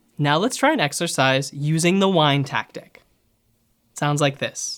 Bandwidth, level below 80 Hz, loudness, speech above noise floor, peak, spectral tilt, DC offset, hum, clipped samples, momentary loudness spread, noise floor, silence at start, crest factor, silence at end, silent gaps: 17.5 kHz; -66 dBFS; -20 LUFS; 45 dB; -2 dBFS; -4.5 dB/octave; under 0.1%; none; under 0.1%; 9 LU; -65 dBFS; 0.2 s; 20 dB; 0 s; none